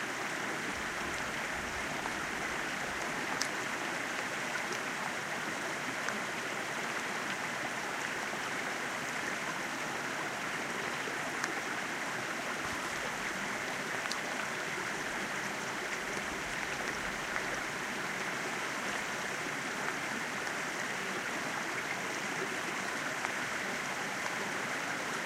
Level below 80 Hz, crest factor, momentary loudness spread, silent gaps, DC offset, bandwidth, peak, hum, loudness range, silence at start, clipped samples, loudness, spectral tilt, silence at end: -64 dBFS; 26 dB; 1 LU; none; under 0.1%; 16 kHz; -10 dBFS; none; 1 LU; 0 s; under 0.1%; -35 LUFS; -2 dB/octave; 0 s